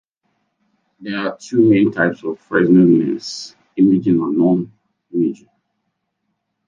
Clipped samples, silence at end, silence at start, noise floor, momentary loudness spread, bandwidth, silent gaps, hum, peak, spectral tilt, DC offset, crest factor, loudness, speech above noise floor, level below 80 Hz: under 0.1%; 1.35 s; 1 s; -73 dBFS; 17 LU; 7.6 kHz; none; none; -2 dBFS; -7 dB/octave; under 0.1%; 16 dB; -16 LUFS; 57 dB; -62 dBFS